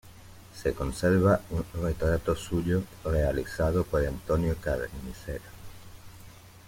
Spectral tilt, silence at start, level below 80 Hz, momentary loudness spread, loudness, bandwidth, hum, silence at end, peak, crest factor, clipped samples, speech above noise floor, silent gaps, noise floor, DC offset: -7 dB/octave; 0.05 s; -40 dBFS; 23 LU; -29 LUFS; 16.5 kHz; none; 0 s; -10 dBFS; 18 dB; under 0.1%; 22 dB; none; -49 dBFS; under 0.1%